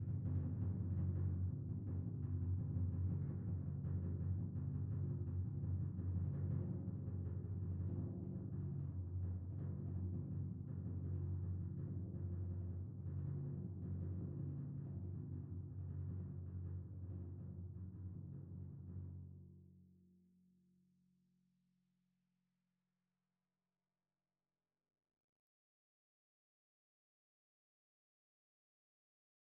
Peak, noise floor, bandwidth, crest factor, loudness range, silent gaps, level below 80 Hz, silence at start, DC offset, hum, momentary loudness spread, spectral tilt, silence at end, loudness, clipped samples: -30 dBFS; under -90 dBFS; 1.9 kHz; 14 dB; 10 LU; none; -62 dBFS; 0 s; under 0.1%; none; 9 LU; -13.5 dB/octave; 9.55 s; -46 LUFS; under 0.1%